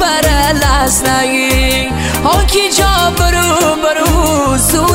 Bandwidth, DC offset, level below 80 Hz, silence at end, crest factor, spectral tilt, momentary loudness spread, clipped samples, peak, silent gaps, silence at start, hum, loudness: 16.5 kHz; under 0.1%; -18 dBFS; 0 s; 10 dB; -3.5 dB/octave; 2 LU; under 0.1%; 0 dBFS; none; 0 s; none; -11 LUFS